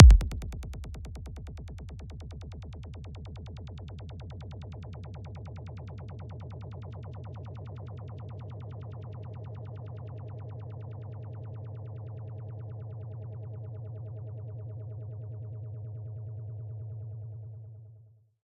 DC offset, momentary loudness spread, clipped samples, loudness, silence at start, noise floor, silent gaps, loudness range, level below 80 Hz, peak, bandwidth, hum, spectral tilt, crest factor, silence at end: under 0.1%; 3 LU; under 0.1%; -37 LUFS; 0 s; -57 dBFS; none; 2 LU; -34 dBFS; -2 dBFS; 7.6 kHz; none; -8 dB/octave; 28 dB; 0.4 s